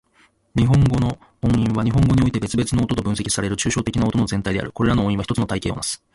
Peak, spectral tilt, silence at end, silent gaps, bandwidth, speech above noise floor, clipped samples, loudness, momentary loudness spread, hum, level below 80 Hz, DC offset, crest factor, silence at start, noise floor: -6 dBFS; -6 dB/octave; 0.2 s; none; 11.5 kHz; 39 dB; under 0.1%; -20 LUFS; 8 LU; none; -36 dBFS; under 0.1%; 14 dB; 0.55 s; -58 dBFS